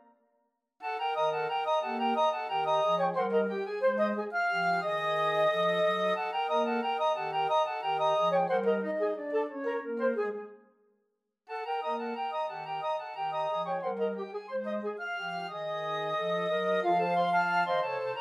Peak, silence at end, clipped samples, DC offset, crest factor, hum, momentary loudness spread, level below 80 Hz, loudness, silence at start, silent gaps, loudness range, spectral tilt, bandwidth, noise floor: -16 dBFS; 0 s; under 0.1%; under 0.1%; 14 dB; none; 8 LU; under -90 dBFS; -30 LUFS; 0.8 s; none; 6 LU; -5.5 dB/octave; 12 kHz; -79 dBFS